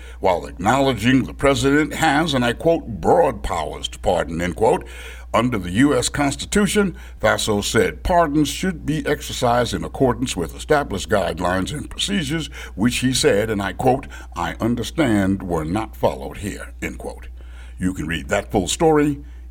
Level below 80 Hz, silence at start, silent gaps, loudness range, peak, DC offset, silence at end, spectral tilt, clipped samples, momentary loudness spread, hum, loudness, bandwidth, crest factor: -36 dBFS; 0 s; none; 4 LU; -4 dBFS; under 0.1%; 0 s; -4.5 dB/octave; under 0.1%; 10 LU; none; -20 LUFS; 17.5 kHz; 16 dB